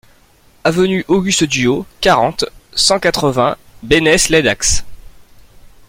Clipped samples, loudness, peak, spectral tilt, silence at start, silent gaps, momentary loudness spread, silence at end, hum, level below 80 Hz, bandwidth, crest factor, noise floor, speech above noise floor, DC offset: under 0.1%; -14 LUFS; 0 dBFS; -3 dB/octave; 0.65 s; none; 8 LU; 0.65 s; none; -34 dBFS; 16.5 kHz; 16 dB; -49 dBFS; 36 dB; under 0.1%